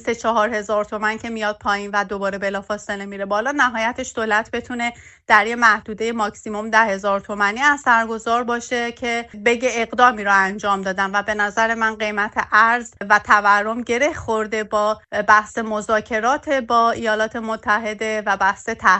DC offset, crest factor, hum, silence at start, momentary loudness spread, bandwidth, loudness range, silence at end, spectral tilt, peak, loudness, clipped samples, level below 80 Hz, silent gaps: under 0.1%; 20 dB; none; 0.05 s; 9 LU; 8.4 kHz; 4 LU; 0 s; -3.5 dB/octave; 0 dBFS; -19 LUFS; under 0.1%; -52 dBFS; none